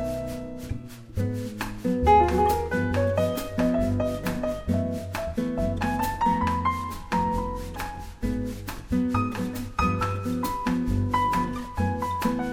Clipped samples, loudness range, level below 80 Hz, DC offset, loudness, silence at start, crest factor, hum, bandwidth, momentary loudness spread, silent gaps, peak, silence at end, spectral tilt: under 0.1%; 4 LU; -38 dBFS; under 0.1%; -27 LUFS; 0 s; 18 dB; none; over 20 kHz; 10 LU; none; -6 dBFS; 0 s; -6.5 dB/octave